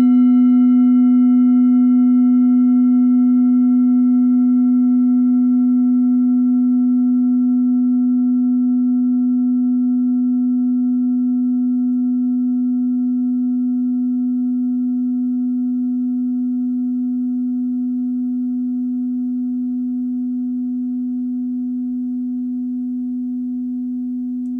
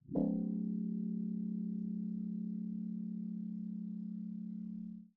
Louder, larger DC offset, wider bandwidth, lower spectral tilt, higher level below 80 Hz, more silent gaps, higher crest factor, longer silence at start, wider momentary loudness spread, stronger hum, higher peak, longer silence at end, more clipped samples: first, -17 LUFS vs -41 LUFS; neither; first, 2.2 kHz vs 1.1 kHz; second, -10 dB/octave vs -14.5 dB/octave; first, -60 dBFS vs -70 dBFS; neither; second, 8 dB vs 18 dB; about the same, 0 s vs 0.05 s; first, 10 LU vs 7 LU; neither; first, -8 dBFS vs -22 dBFS; about the same, 0 s vs 0.1 s; neither